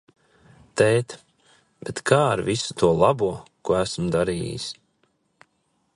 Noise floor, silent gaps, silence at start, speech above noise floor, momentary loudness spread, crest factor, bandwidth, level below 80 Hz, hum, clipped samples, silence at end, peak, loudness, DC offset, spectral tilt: -70 dBFS; none; 0.75 s; 48 dB; 15 LU; 22 dB; 11.5 kHz; -50 dBFS; none; under 0.1%; 1.2 s; -2 dBFS; -23 LUFS; under 0.1%; -5 dB/octave